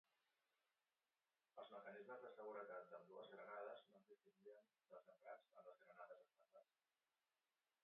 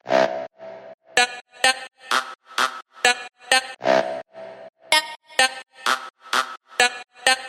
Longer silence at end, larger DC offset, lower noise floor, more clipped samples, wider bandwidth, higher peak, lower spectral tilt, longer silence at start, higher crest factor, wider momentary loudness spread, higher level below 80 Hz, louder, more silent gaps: first, 1.2 s vs 0 s; neither; first, under -90 dBFS vs -39 dBFS; neither; second, 4.2 kHz vs 16 kHz; second, -42 dBFS vs 0 dBFS; first, -2 dB/octave vs 0 dB/octave; first, 1.55 s vs 0.05 s; about the same, 20 dB vs 24 dB; second, 12 LU vs 15 LU; second, under -90 dBFS vs -70 dBFS; second, -61 LUFS vs -22 LUFS; second, none vs 0.94-0.98 s, 1.41-1.45 s